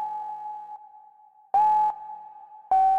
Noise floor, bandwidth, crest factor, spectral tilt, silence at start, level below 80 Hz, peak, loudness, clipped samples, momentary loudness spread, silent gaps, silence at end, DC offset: -55 dBFS; 5.2 kHz; 12 dB; -4.5 dB/octave; 0 s; -68 dBFS; -14 dBFS; -25 LUFS; under 0.1%; 23 LU; none; 0 s; under 0.1%